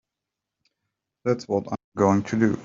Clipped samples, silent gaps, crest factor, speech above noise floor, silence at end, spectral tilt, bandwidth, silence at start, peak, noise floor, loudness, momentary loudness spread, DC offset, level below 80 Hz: under 0.1%; 1.84-1.92 s; 20 dB; 63 dB; 0 s; -7.5 dB/octave; 7.6 kHz; 1.25 s; -4 dBFS; -86 dBFS; -24 LUFS; 9 LU; under 0.1%; -64 dBFS